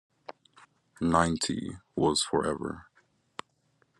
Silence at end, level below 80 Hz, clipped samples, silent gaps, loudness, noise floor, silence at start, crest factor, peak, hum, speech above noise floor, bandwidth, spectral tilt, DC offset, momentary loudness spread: 1.15 s; -58 dBFS; under 0.1%; none; -29 LUFS; -71 dBFS; 0.3 s; 24 dB; -8 dBFS; none; 43 dB; 12 kHz; -4 dB/octave; under 0.1%; 21 LU